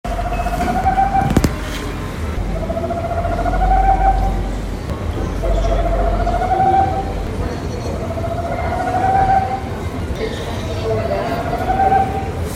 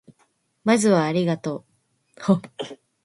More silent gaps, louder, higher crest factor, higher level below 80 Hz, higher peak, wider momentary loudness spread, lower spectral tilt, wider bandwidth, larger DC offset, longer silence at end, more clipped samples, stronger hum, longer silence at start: neither; first, -19 LUFS vs -22 LUFS; about the same, 18 dB vs 20 dB; first, -24 dBFS vs -66 dBFS; first, 0 dBFS vs -4 dBFS; second, 9 LU vs 18 LU; about the same, -6.5 dB/octave vs -6 dB/octave; first, 15.5 kHz vs 11.5 kHz; neither; second, 0 s vs 0.3 s; neither; neither; second, 0.05 s vs 0.65 s